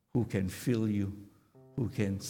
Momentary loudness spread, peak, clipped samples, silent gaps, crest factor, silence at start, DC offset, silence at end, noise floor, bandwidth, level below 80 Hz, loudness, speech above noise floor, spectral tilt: 10 LU; -16 dBFS; under 0.1%; none; 16 dB; 0.15 s; under 0.1%; 0 s; -59 dBFS; 18.5 kHz; -62 dBFS; -34 LUFS; 27 dB; -7 dB/octave